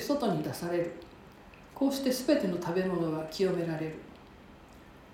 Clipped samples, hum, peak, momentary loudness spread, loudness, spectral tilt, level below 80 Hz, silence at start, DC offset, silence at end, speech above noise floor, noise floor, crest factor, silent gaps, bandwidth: under 0.1%; none; -14 dBFS; 23 LU; -31 LUFS; -6 dB/octave; -60 dBFS; 0 s; under 0.1%; 0 s; 22 dB; -53 dBFS; 20 dB; none; 16.5 kHz